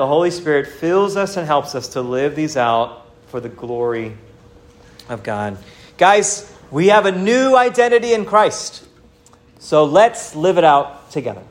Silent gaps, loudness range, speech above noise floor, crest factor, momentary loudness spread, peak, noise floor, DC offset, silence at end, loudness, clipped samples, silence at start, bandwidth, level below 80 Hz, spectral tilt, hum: none; 8 LU; 33 dB; 16 dB; 15 LU; 0 dBFS; -49 dBFS; under 0.1%; 0.05 s; -16 LUFS; under 0.1%; 0 s; 16 kHz; -54 dBFS; -4 dB/octave; none